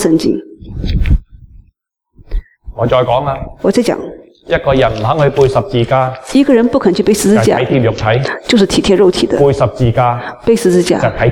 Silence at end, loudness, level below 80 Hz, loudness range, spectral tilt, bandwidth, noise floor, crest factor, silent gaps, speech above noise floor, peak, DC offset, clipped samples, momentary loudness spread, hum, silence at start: 0 s; -12 LUFS; -26 dBFS; 6 LU; -6 dB/octave; 17.5 kHz; -56 dBFS; 12 dB; none; 45 dB; 0 dBFS; under 0.1%; under 0.1%; 10 LU; none; 0 s